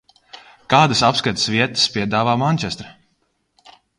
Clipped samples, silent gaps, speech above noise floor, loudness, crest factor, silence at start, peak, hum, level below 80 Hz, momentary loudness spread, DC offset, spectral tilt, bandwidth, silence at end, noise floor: under 0.1%; none; 49 dB; -17 LUFS; 20 dB; 0.35 s; 0 dBFS; none; -52 dBFS; 7 LU; under 0.1%; -4 dB/octave; 11 kHz; 1.05 s; -67 dBFS